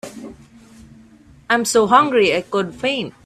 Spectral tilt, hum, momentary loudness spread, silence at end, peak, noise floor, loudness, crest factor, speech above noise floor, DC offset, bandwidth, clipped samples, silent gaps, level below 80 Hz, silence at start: -3.5 dB/octave; none; 22 LU; 0.15 s; 0 dBFS; -47 dBFS; -17 LUFS; 20 dB; 30 dB; under 0.1%; 15 kHz; under 0.1%; none; -54 dBFS; 0.05 s